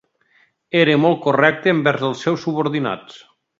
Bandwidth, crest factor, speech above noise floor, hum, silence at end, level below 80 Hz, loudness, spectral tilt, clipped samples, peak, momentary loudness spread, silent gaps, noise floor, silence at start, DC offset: 7.6 kHz; 18 dB; 42 dB; none; 0.4 s; -64 dBFS; -18 LUFS; -6.5 dB/octave; under 0.1%; 0 dBFS; 8 LU; none; -59 dBFS; 0.75 s; under 0.1%